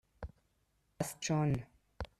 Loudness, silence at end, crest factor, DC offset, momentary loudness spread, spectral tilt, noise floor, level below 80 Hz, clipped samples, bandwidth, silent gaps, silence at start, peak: -36 LUFS; 0.15 s; 20 dB; under 0.1%; 18 LU; -5.5 dB/octave; -77 dBFS; -56 dBFS; under 0.1%; 14.5 kHz; none; 0.2 s; -20 dBFS